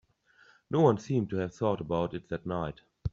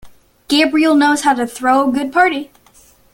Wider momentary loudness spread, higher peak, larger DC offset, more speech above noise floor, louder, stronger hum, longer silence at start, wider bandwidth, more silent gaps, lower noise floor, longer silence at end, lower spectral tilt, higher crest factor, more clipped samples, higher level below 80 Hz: first, 11 LU vs 5 LU; second, -12 dBFS vs -2 dBFS; neither; about the same, 33 dB vs 35 dB; second, -31 LUFS vs -14 LUFS; neither; first, 0.7 s vs 0.05 s; second, 7.8 kHz vs 17 kHz; neither; first, -63 dBFS vs -49 dBFS; second, 0.05 s vs 0.7 s; first, -7.5 dB/octave vs -2.5 dB/octave; first, 20 dB vs 14 dB; neither; about the same, -54 dBFS vs -54 dBFS